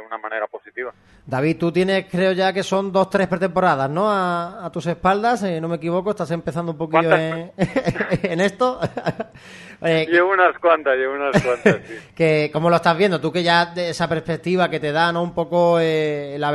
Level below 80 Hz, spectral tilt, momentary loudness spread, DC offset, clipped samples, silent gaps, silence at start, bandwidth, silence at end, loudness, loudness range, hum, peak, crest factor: -52 dBFS; -6 dB/octave; 10 LU; under 0.1%; under 0.1%; none; 0 s; 12 kHz; 0 s; -20 LUFS; 3 LU; none; 0 dBFS; 18 dB